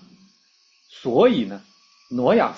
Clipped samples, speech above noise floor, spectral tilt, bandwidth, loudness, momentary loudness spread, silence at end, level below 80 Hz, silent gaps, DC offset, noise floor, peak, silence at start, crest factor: under 0.1%; 41 dB; -7 dB/octave; 7 kHz; -21 LUFS; 14 LU; 0 s; -62 dBFS; none; under 0.1%; -60 dBFS; -4 dBFS; 1.05 s; 18 dB